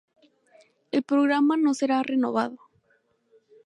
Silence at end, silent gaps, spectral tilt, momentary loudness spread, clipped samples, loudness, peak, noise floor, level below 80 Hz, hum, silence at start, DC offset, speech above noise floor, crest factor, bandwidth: 1.1 s; none; -4.5 dB/octave; 8 LU; under 0.1%; -24 LUFS; -10 dBFS; -68 dBFS; -80 dBFS; none; 0.95 s; under 0.1%; 45 dB; 16 dB; 11 kHz